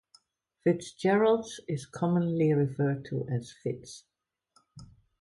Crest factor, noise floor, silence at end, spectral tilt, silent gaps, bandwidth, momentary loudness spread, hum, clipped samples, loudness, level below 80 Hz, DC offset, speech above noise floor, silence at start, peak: 16 dB; -70 dBFS; 0.35 s; -7 dB/octave; none; 11.5 kHz; 12 LU; none; under 0.1%; -29 LUFS; -66 dBFS; under 0.1%; 41 dB; 0.65 s; -14 dBFS